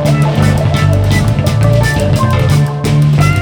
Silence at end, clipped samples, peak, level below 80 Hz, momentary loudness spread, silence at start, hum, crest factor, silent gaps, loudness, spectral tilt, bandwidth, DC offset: 0 s; under 0.1%; 0 dBFS; -24 dBFS; 2 LU; 0 s; none; 10 dB; none; -11 LUFS; -6.5 dB/octave; 18 kHz; under 0.1%